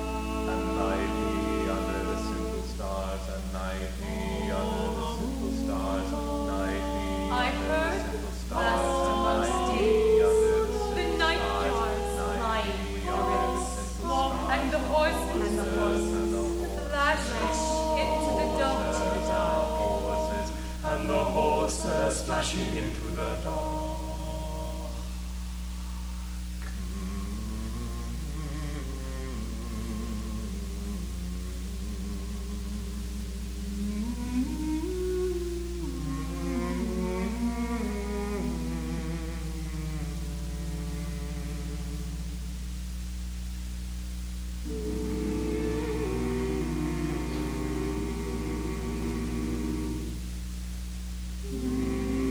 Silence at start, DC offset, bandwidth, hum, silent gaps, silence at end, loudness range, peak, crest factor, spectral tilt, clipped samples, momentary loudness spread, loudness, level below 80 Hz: 0 s; under 0.1%; over 20 kHz; 60 Hz at -35 dBFS; none; 0 s; 10 LU; -12 dBFS; 18 dB; -5.5 dB/octave; under 0.1%; 11 LU; -30 LUFS; -36 dBFS